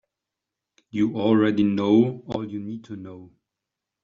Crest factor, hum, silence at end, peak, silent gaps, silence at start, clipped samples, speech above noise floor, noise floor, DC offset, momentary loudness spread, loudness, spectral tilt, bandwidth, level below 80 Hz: 18 dB; none; 0.75 s; -6 dBFS; none; 0.95 s; under 0.1%; 63 dB; -86 dBFS; under 0.1%; 18 LU; -22 LUFS; -6.5 dB/octave; 7 kHz; -62 dBFS